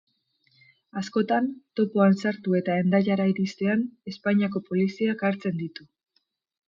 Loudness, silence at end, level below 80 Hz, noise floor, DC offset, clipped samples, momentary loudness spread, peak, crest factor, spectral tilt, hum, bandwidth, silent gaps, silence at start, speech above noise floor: -25 LUFS; 1 s; -72 dBFS; -73 dBFS; under 0.1%; under 0.1%; 12 LU; -10 dBFS; 16 dB; -7.5 dB/octave; none; 7.4 kHz; none; 0.95 s; 49 dB